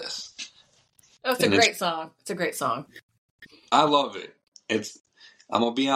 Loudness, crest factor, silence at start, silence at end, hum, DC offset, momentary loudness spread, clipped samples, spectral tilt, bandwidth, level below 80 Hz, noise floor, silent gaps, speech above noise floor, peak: -25 LUFS; 22 dB; 0 s; 0 s; none; under 0.1%; 20 LU; under 0.1%; -3 dB/octave; 16 kHz; -72 dBFS; -61 dBFS; 3.03-3.09 s, 3.18-3.39 s, 4.48-4.52 s, 5.00-5.04 s; 37 dB; -6 dBFS